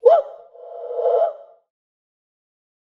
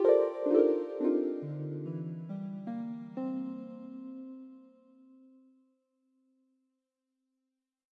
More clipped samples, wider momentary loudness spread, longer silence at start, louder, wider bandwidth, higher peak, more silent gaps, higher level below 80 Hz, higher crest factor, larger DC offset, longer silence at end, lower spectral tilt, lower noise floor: neither; first, 23 LU vs 19 LU; about the same, 0.05 s vs 0 s; first, -20 LUFS vs -33 LUFS; about the same, 5.6 kHz vs 5.2 kHz; first, -2 dBFS vs -12 dBFS; neither; about the same, -86 dBFS vs under -90 dBFS; about the same, 20 dB vs 22 dB; neither; second, 1.5 s vs 3.35 s; second, -3.5 dB/octave vs -10.5 dB/octave; second, -39 dBFS vs -86 dBFS